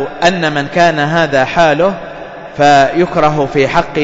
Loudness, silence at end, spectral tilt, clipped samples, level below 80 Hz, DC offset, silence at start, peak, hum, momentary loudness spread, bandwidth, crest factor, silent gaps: -11 LUFS; 0 s; -5.5 dB/octave; under 0.1%; -38 dBFS; under 0.1%; 0 s; 0 dBFS; none; 10 LU; 7.8 kHz; 12 dB; none